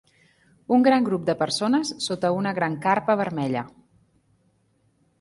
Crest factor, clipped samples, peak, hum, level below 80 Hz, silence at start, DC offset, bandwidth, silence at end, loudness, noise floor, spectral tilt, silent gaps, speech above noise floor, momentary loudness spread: 18 dB; under 0.1%; -6 dBFS; none; -66 dBFS; 0.7 s; under 0.1%; 11.5 kHz; 1.5 s; -23 LUFS; -66 dBFS; -5 dB/octave; none; 43 dB; 8 LU